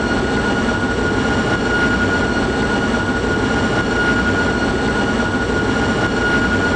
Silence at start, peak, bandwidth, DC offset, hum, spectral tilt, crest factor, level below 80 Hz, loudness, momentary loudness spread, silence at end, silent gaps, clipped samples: 0 s; -6 dBFS; 9.8 kHz; under 0.1%; none; -5.5 dB/octave; 10 dB; -30 dBFS; -17 LUFS; 2 LU; 0 s; none; under 0.1%